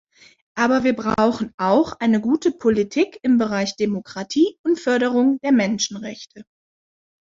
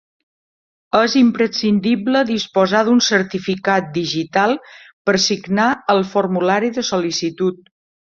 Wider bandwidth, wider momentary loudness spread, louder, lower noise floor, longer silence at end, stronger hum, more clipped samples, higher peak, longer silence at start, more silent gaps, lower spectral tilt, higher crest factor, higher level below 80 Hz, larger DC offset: about the same, 7.6 kHz vs 7.4 kHz; about the same, 7 LU vs 7 LU; second, -20 LUFS vs -17 LUFS; about the same, under -90 dBFS vs under -90 dBFS; first, 0.8 s vs 0.65 s; neither; neither; about the same, -4 dBFS vs -2 dBFS; second, 0.55 s vs 0.95 s; about the same, 1.54-1.58 s, 4.59-4.64 s vs 4.93-5.05 s; about the same, -5 dB/octave vs -4.5 dB/octave; about the same, 16 dB vs 16 dB; about the same, -56 dBFS vs -60 dBFS; neither